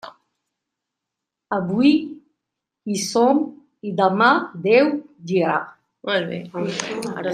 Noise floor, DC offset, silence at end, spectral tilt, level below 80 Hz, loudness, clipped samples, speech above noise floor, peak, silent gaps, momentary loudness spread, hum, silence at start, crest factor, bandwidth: -84 dBFS; under 0.1%; 0 s; -5 dB/octave; -70 dBFS; -20 LUFS; under 0.1%; 64 dB; -2 dBFS; none; 14 LU; none; 0.05 s; 20 dB; 14.5 kHz